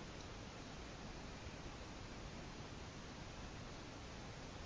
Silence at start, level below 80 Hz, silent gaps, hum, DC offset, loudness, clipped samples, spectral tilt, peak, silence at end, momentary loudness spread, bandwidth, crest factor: 0 s; -58 dBFS; none; none; under 0.1%; -52 LUFS; under 0.1%; -4.5 dB/octave; -38 dBFS; 0 s; 1 LU; 8 kHz; 14 dB